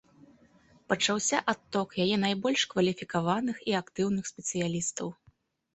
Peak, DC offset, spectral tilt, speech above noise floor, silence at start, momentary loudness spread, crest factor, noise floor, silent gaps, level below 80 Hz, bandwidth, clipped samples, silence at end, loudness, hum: -8 dBFS; under 0.1%; -3.5 dB/octave; 36 dB; 0.9 s; 6 LU; 22 dB; -65 dBFS; none; -66 dBFS; 8.6 kHz; under 0.1%; 0.6 s; -29 LUFS; none